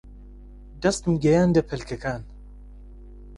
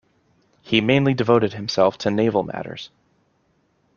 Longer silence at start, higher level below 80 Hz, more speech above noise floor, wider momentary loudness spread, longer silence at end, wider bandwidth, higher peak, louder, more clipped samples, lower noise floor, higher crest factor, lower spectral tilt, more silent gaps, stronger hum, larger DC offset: second, 0.05 s vs 0.65 s; first, -42 dBFS vs -58 dBFS; second, 21 dB vs 45 dB; about the same, 14 LU vs 15 LU; second, 0 s vs 1.1 s; first, 11.5 kHz vs 7.2 kHz; second, -8 dBFS vs -2 dBFS; second, -23 LUFS vs -20 LUFS; neither; second, -43 dBFS vs -65 dBFS; about the same, 18 dB vs 20 dB; about the same, -6.5 dB/octave vs -6.5 dB/octave; neither; first, 50 Hz at -40 dBFS vs none; neither